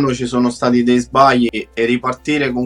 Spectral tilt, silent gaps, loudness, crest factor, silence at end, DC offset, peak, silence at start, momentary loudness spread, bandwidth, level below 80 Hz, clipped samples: -5.5 dB/octave; none; -15 LUFS; 14 dB; 0 s; under 0.1%; 0 dBFS; 0 s; 7 LU; 11 kHz; -44 dBFS; under 0.1%